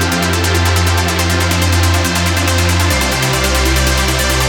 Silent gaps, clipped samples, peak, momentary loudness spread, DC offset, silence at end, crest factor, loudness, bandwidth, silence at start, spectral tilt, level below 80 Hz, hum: none; under 0.1%; 0 dBFS; 1 LU; under 0.1%; 0 s; 12 dB; -13 LUFS; over 20 kHz; 0 s; -3.5 dB/octave; -22 dBFS; none